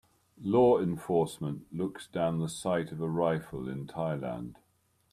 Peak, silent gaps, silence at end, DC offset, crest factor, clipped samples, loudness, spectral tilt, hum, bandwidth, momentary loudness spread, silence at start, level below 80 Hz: -12 dBFS; none; 0.6 s; under 0.1%; 18 dB; under 0.1%; -31 LUFS; -7 dB/octave; none; 14.5 kHz; 13 LU; 0.4 s; -62 dBFS